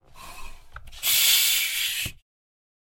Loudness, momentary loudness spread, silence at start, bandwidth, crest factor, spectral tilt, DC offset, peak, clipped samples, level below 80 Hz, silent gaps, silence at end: -20 LUFS; 12 LU; 0.15 s; 17 kHz; 20 dB; 2 dB/octave; under 0.1%; -8 dBFS; under 0.1%; -48 dBFS; none; 0.85 s